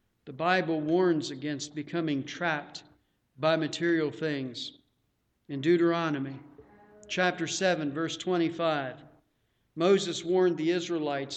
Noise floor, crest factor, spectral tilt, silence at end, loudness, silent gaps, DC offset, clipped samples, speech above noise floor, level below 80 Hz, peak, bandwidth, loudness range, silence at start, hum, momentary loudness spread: -75 dBFS; 20 dB; -5 dB/octave; 0 s; -29 LUFS; none; under 0.1%; under 0.1%; 47 dB; -74 dBFS; -10 dBFS; 8.8 kHz; 3 LU; 0.25 s; none; 13 LU